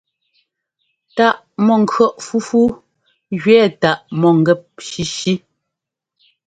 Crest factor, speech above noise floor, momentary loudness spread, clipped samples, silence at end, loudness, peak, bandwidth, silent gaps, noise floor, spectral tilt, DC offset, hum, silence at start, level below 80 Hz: 16 dB; 67 dB; 12 LU; under 0.1%; 1.1 s; -16 LUFS; 0 dBFS; 9.2 kHz; none; -82 dBFS; -5.5 dB/octave; under 0.1%; none; 1.15 s; -54 dBFS